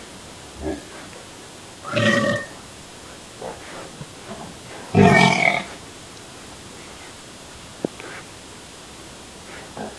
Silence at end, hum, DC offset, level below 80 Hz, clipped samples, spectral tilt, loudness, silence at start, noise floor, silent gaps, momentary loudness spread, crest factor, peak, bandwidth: 0 s; none; under 0.1%; -52 dBFS; under 0.1%; -5 dB/octave; -19 LUFS; 0 s; -40 dBFS; none; 23 LU; 24 dB; 0 dBFS; 12 kHz